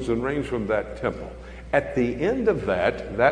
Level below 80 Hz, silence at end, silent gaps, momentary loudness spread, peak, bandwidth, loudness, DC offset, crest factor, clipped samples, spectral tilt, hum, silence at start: -42 dBFS; 0 s; none; 8 LU; -4 dBFS; 10.5 kHz; -25 LUFS; under 0.1%; 20 dB; under 0.1%; -7 dB/octave; none; 0 s